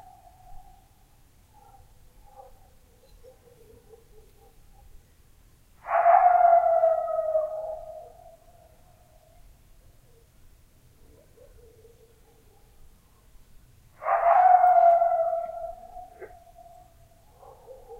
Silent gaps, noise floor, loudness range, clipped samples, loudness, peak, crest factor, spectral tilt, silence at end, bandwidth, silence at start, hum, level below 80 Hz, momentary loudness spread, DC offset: none; -57 dBFS; 12 LU; under 0.1%; -21 LUFS; -6 dBFS; 20 dB; -5 dB/octave; 0.05 s; 3.5 kHz; 0.5 s; none; -56 dBFS; 27 LU; under 0.1%